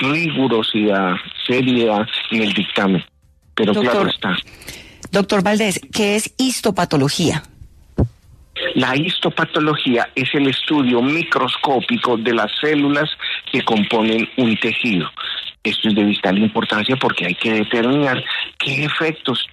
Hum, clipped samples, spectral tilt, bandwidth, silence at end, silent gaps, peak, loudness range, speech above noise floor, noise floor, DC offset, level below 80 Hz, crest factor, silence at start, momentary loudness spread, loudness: none; under 0.1%; -4.5 dB/octave; 14 kHz; 0.05 s; none; -2 dBFS; 2 LU; 24 dB; -42 dBFS; under 0.1%; -46 dBFS; 16 dB; 0 s; 6 LU; -17 LUFS